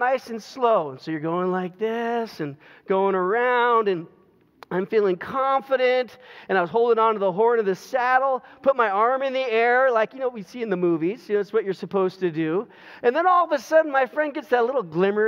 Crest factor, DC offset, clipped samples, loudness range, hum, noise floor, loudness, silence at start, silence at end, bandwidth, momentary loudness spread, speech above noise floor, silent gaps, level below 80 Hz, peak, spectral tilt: 16 dB; under 0.1%; under 0.1%; 3 LU; none; -51 dBFS; -22 LUFS; 0 s; 0 s; 14.5 kHz; 9 LU; 29 dB; none; -76 dBFS; -6 dBFS; -6.5 dB/octave